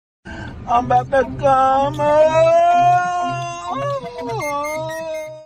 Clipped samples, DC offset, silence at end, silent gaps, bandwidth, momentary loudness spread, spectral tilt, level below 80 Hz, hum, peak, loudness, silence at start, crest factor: under 0.1%; under 0.1%; 0 s; none; 15.5 kHz; 14 LU; -5.5 dB/octave; -44 dBFS; none; -4 dBFS; -17 LUFS; 0.25 s; 14 dB